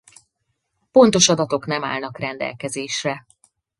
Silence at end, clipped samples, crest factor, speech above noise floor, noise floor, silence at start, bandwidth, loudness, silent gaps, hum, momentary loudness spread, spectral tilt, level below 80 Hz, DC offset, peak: 0.6 s; under 0.1%; 22 dB; 55 dB; -74 dBFS; 0.95 s; 11.5 kHz; -19 LUFS; none; none; 14 LU; -3.5 dB/octave; -60 dBFS; under 0.1%; 0 dBFS